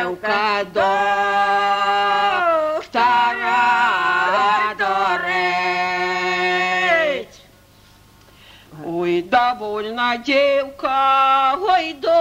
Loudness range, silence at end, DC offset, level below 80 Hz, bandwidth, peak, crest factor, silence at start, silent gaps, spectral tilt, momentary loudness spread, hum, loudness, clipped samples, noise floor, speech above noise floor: 5 LU; 0 s; under 0.1%; -56 dBFS; 16 kHz; -4 dBFS; 14 dB; 0 s; none; -3.5 dB/octave; 6 LU; 50 Hz at -55 dBFS; -18 LUFS; under 0.1%; -49 dBFS; 32 dB